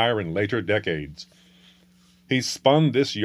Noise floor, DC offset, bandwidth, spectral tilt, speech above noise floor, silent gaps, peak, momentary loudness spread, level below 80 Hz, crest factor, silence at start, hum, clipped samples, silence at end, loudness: -57 dBFS; under 0.1%; 14.5 kHz; -5 dB/octave; 34 dB; none; -4 dBFS; 12 LU; -56 dBFS; 20 dB; 0 s; 60 Hz at -55 dBFS; under 0.1%; 0 s; -23 LUFS